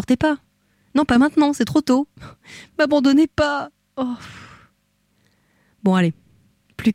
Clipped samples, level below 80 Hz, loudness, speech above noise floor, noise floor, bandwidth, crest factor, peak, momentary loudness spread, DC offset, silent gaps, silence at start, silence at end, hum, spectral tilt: under 0.1%; -48 dBFS; -19 LUFS; 47 dB; -65 dBFS; 14 kHz; 14 dB; -6 dBFS; 18 LU; under 0.1%; none; 0 s; 0 s; 50 Hz at -60 dBFS; -6 dB/octave